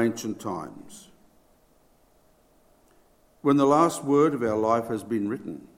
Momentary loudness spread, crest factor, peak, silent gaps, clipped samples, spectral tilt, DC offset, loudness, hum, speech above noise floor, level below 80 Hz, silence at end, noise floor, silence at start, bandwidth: 16 LU; 20 dB; -6 dBFS; none; under 0.1%; -6 dB/octave; under 0.1%; -25 LUFS; none; 37 dB; -66 dBFS; 0.1 s; -61 dBFS; 0 s; 16.5 kHz